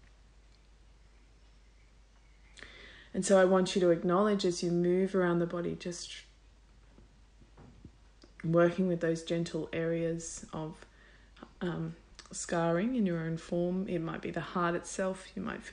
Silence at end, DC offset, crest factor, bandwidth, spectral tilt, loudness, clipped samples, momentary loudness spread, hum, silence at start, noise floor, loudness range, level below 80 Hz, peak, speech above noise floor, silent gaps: 0 s; under 0.1%; 20 dB; 10.5 kHz; -5.5 dB/octave; -32 LUFS; under 0.1%; 16 LU; none; 2.55 s; -60 dBFS; 8 LU; -60 dBFS; -14 dBFS; 29 dB; none